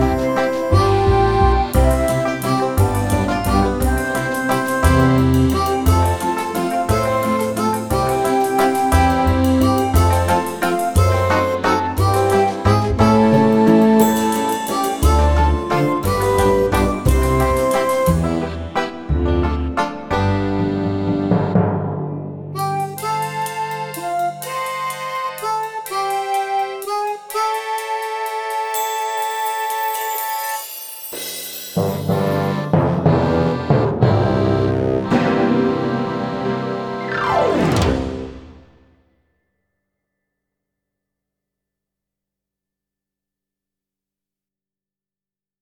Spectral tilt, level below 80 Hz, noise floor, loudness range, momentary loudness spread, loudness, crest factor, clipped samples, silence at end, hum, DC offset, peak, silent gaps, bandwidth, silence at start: -6 dB/octave; -28 dBFS; under -90 dBFS; 7 LU; 9 LU; -18 LUFS; 16 dB; under 0.1%; 7.05 s; none; under 0.1%; -2 dBFS; none; 19.5 kHz; 0 s